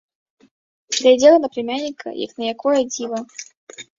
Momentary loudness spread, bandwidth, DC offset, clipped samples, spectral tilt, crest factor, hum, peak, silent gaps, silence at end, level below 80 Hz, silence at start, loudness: 22 LU; 7.8 kHz; under 0.1%; under 0.1%; -2.5 dB/octave; 18 dB; none; -2 dBFS; 3.57-3.67 s; 0.15 s; -66 dBFS; 0.9 s; -18 LUFS